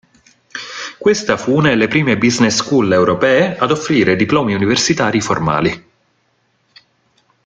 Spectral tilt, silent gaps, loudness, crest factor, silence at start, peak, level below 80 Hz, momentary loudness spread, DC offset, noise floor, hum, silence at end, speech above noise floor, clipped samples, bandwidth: -4.5 dB/octave; none; -14 LUFS; 16 dB; 0.55 s; 0 dBFS; -48 dBFS; 10 LU; under 0.1%; -61 dBFS; none; 1.65 s; 48 dB; under 0.1%; 9.4 kHz